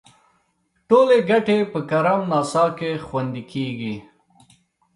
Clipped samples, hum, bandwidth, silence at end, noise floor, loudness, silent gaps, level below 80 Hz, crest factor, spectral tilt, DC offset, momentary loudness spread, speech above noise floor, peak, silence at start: under 0.1%; none; 11.5 kHz; 0.95 s; -68 dBFS; -20 LUFS; none; -60 dBFS; 18 dB; -6 dB/octave; under 0.1%; 13 LU; 48 dB; -4 dBFS; 0.9 s